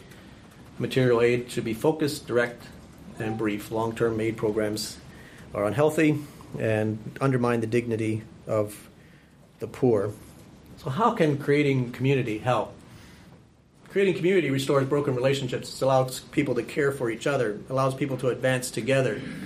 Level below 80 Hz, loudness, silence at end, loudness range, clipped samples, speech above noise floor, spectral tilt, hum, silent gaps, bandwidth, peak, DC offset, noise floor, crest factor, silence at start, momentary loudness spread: -56 dBFS; -26 LUFS; 0 s; 3 LU; under 0.1%; 30 dB; -6 dB/octave; none; none; 15.5 kHz; -8 dBFS; under 0.1%; -55 dBFS; 18 dB; 0 s; 12 LU